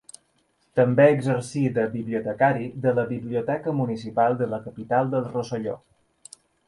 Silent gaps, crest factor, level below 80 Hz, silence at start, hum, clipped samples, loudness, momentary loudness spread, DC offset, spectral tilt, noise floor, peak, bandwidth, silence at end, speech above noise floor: none; 20 dB; -62 dBFS; 0.75 s; none; under 0.1%; -24 LUFS; 11 LU; under 0.1%; -7.5 dB/octave; -67 dBFS; -6 dBFS; 11.5 kHz; 0.9 s; 44 dB